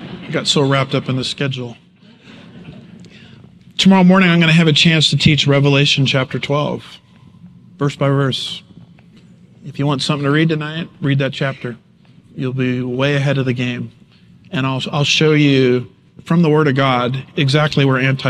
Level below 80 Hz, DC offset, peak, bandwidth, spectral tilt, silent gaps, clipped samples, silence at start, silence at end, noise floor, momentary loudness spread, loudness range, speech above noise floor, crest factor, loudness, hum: -52 dBFS; under 0.1%; 0 dBFS; 10.5 kHz; -5.5 dB/octave; none; under 0.1%; 0 s; 0 s; -46 dBFS; 14 LU; 9 LU; 32 dB; 16 dB; -15 LUFS; none